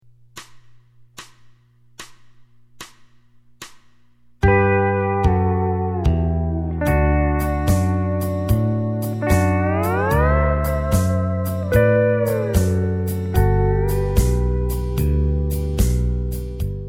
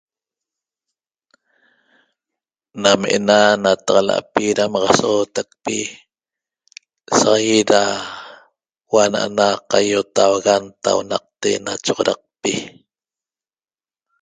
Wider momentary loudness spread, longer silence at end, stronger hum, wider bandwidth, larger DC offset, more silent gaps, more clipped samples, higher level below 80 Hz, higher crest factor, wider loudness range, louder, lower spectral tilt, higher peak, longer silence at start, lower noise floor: first, 14 LU vs 10 LU; second, 0 s vs 1.55 s; first, 60 Hz at -45 dBFS vs none; first, 16.5 kHz vs 9.6 kHz; neither; neither; neither; first, -26 dBFS vs -58 dBFS; about the same, 18 dB vs 20 dB; about the same, 3 LU vs 5 LU; second, -20 LUFS vs -17 LUFS; first, -7.5 dB/octave vs -3 dB/octave; about the same, -2 dBFS vs 0 dBFS; second, 0.35 s vs 2.75 s; second, -51 dBFS vs under -90 dBFS